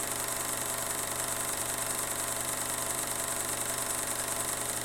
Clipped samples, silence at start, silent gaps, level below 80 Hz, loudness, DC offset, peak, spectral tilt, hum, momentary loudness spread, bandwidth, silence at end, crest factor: under 0.1%; 0 s; none; -56 dBFS; -31 LUFS; under 0.1%; -14 dBFS; -1 dB/octave; none; 1 LU; 17 kHz; 0 s; 18 dB